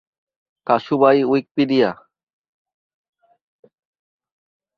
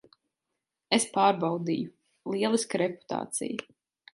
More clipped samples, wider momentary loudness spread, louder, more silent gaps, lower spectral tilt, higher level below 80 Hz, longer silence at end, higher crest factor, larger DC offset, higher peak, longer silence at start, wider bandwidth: neither; about the same, 11 LU vs 12 LU; first, -18 LUFS vs -28 LUFS; first, 1.51-1.55 s vs none; first, -8 dB/octave vs -4 dB/octave; first, -68 dBFS vs -76 dBFS; first, 2.85 s vs 0.5 s; about the same, 20 dB vs 20 dB; neither; first, -2 dBFS vs -10 dBFS; second, 0.7 s vs 0.9 s; second, 6.2 kHz vs 11.5 kHz